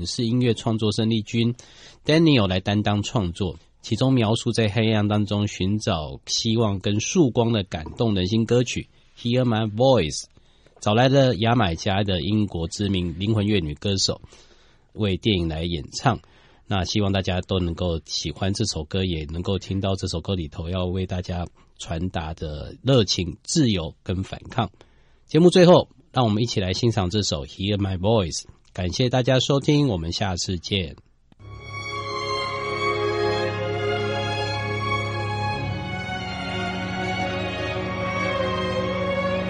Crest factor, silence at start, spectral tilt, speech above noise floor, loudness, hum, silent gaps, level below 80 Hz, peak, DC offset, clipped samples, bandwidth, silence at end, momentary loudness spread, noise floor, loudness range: 20 dB; 0 s; -5.5 dB/octave; 32 dB; -23 LUFS; none; none; -44 dBFS; -4 dBFS; under 0.1%; under 0.1%; 10.5 kHz; 0 s; 10 LU; -54 dBFS; 6 LU